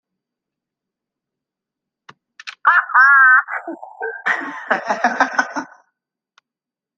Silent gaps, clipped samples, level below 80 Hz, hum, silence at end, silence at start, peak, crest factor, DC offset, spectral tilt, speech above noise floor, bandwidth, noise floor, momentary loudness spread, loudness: none; under 0.1%; -74 dBFS; none; 1.3 s; 2.45 s; 0 dBFS; 18 dB; under 0.1%; -2.5 dB/octave; 67 dB; 7.6 kHz; -88 dBFS; 20 LU; -14 LUFS